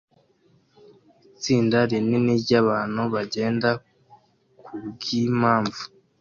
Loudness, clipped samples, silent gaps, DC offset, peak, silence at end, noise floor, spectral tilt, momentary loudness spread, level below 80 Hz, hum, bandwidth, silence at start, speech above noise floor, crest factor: -23 LUFS; under 0.1%; none; under 0.1%; -6 dBFS; 0.35 s; -61 dBFS; -6 dB/octave; 16 LU; -60 dBFS; none; 7.2 kHz; 1.4 s; 40 dB; 18 dB